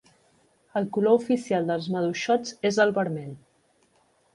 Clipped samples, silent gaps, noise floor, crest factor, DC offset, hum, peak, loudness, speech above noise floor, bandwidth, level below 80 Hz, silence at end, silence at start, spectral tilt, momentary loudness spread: under 0.1%; none; -65 dBFS; 20 dB; under 0.1%; none; -8 dBFS; -25 LUFS; 41 dB; 11.5 kHz; -70 dBFS; 1 s; 0.75 s; -5.5 dB/octave; 9 LU